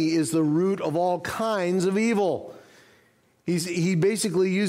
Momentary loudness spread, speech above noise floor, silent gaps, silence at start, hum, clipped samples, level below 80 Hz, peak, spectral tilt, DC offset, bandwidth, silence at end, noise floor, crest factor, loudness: 6 LU; 38 dB; none; 0 s; none; under 0.1%; -64 dBFS; -12 dBFS; -5.5 dB/octave; under 0.1%; 16 kHz; 0 s; -62 dBFS; 12 dB; -24 LUFS